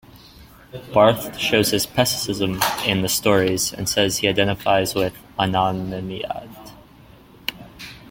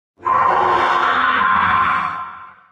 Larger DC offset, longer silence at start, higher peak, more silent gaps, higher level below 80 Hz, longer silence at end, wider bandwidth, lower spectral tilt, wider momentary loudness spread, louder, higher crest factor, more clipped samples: neither; about the same, 0.15 s vs 0.2 s; about the same, -2 dBFS vs -2 dBFS; neither; about the same, -48 dBFS vs -50 dBFS; second, 0 s vs 0.2 s; first, 17 kHz vs 9.2 kHz; about the same, -3.5 dB/octave vs -4.5 dB/octave; first, 14 LU vs 9 LU; second, -20 LUFS vs -15 LUFS; first, 20 dB vs 14 dB; neither